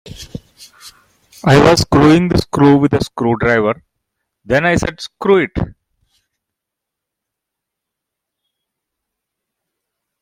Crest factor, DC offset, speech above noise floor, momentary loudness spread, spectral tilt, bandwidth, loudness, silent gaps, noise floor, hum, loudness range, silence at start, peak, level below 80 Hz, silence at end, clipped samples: 16 dB; under 0.1%; 69 dB; 17 LU; -6 dB/octave; 16 kHz; -13 LUFS; none; -81 dBFS; none; 9 LU; 0.05 s; 0 dBFS; -38 dBFS; 4.5 s; under 0.1%